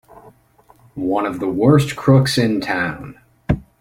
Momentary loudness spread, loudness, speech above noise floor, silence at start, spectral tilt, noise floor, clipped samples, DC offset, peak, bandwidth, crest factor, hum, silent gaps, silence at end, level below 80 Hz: 20 LU; -17 LUFS; 36 dB; 0.95 s; -6.5 dB/octave; -52 dBFS; under 0.1%; under 0.1%; 0 dBFS; 15.5 kHz; 18 dB; none; none; 0.2 s; -42 dBFS